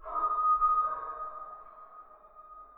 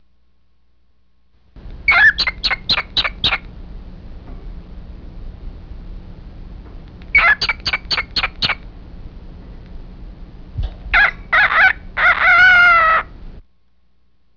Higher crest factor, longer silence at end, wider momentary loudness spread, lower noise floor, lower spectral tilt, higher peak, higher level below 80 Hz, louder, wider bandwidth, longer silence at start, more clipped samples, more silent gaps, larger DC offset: about the same, 14 dB vs 16 dB; second, 0.1 s vs 0.95 s; first, 25 LU vs 20 LU; second, -54 dBFS vs -62 dBFS; first, -7.5 dB/octave vs -3 dB/octave; second, -18 dBFS vs -2 dBFS; second, -58 dBFS vs -34 dBFS; second, -29 LUFS vs -13 LUFS; second, 3.9 kHz vs 5.4 kHz; second, 0 s vs 1.55 s; neither; neither; second, under 0.1% vs 0.3%